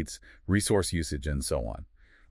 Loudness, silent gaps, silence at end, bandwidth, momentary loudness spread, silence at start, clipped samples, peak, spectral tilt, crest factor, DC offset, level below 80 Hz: -29 LUFS; none; 0.45 s; 12 kHz; 15 LU; 0 s; under 0.1%; -12 dBFS; -5 dB/octave; 18 dB; under 0.1%; -42 dBFS